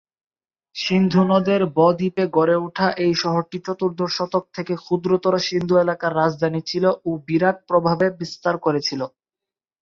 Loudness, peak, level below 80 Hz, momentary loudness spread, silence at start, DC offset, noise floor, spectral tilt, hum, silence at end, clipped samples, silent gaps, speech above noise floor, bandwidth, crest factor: -20 LUFS; -4 dBFS; -60 dBFS; 8 LU; 0.75 s; under 0.1%; -89 dBFS; -6 dB/octave; none; 0.75 s; under 0.1%; none; 69 dB; 7.2 kHz; 16 dB